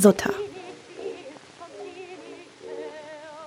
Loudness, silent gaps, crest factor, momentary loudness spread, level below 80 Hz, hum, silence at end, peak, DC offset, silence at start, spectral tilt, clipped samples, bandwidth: -31 LUFS; none; 24 dB; 16 LU; -64 dBFS; none; 0 s; -4 dBFS; under 0.1%; 0 s; -5 dB/octave; under 0.1%; 16 kHz